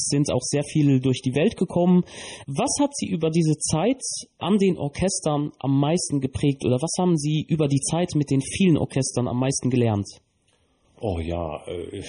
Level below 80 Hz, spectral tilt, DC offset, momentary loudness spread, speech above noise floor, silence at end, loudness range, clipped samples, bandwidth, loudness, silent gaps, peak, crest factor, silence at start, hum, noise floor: -48 dBFS; -5.5 dB/octave; under 0.1%; 9 LU; 43 dB; 0 s; 2 LU; under 0.1%; 10.5 kHz; -23 LUFS; none; -10 dBFS; 14 dB; 0 s; none; -65 dBFS